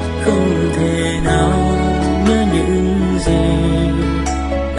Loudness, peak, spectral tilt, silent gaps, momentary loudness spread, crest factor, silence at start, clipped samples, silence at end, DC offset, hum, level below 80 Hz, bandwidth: -15 LUFS; -2 dBFS; -6.5 dB/octave; none; 3 LU; 14 dB; 0 s; under 0.1%; 0 s; under 0.1%; none; -22 dBFS; 11.5 kHz